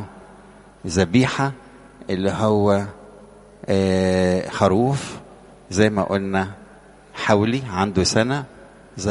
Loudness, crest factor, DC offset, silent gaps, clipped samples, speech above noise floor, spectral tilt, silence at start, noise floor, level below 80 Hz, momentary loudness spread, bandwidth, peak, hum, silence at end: -20 LUFS; 20 dB; under 0.1%; none; under 0.1%; 27 dB; -5.5 dB/octave; 0 s; -47 dBFS; -48 dBFS; 19 LU; 11.5 kHz; 0 dBFS; 50 Hz at -45 dBFS; 0 s